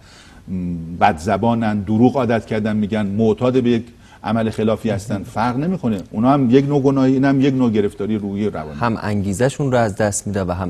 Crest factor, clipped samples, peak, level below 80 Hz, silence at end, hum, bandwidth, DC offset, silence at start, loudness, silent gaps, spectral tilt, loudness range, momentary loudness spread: 18 dB; under 0.1%; 0 dBFS; -42 dBFS; 0 s; none; 13.5 kHz; under 0.1%; 0.45 s; -18 LUFS; none; -6.5 dB/octave; 3 LU; 8 LU